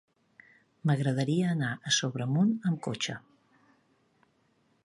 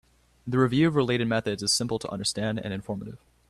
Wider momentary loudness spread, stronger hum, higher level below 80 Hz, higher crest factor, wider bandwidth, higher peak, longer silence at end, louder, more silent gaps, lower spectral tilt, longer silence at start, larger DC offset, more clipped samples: second, 7 LU vs 13 LU; neither; second, -74 dBFS vs -56 dBFS; about the same, 18 dB vs 18 dB; second, 11.5 kHz vs 13.5 kHz; about the same, -12 dBFS vs -10 dBFS; first, 1.65 s vs 0.35 s; second, -29 LUFS vs -26 LUFS; neither; about the same, -5 dB/octave vs -4.5 dB/octave; first, 0.85 s vs 0.45 s; neither; neither